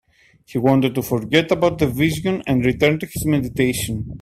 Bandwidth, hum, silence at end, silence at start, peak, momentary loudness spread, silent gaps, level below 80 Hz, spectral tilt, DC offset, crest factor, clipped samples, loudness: 16 kHz; none; 0 s; 0.5 s; 0 dBFS; 6 LU; none; -42 dBFS; -5.5 dB/octave; under 0.1%; 18 dB; under 0.1%; -19 LUFS